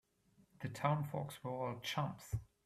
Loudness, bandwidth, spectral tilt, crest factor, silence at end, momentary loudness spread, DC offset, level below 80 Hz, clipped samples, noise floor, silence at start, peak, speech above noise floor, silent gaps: -42 LUFS; 15 kHz; -6 dB/octave; 20 dB; 0.2 s; 9 LU; under 0.1%; -62 dBFS; under 0.1%; -72 dBFS; 0.6 s; -22 dBFS; 32 dB; none